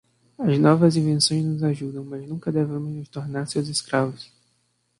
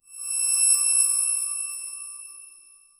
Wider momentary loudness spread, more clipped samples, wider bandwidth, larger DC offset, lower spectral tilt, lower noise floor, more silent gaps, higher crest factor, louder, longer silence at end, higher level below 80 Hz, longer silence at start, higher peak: second, 14 LU vs 19 LU; neither; second, 11.5 kHz vs 17 kHz; neither; first, -5.5 dB/octave vs 5 dB/octave; first, -69 dBFS vs -53 dBFS; neither; about the same, 20 dB vs 16 dB; second, -23 LUFS vs -20 LUFS; first, 0.75 s vs 0.5 s; first, -62 dBFS vs -72 dBFS; first, 0.4 s vs 0.1 s; first, -4 dBFS vs -8 dBFS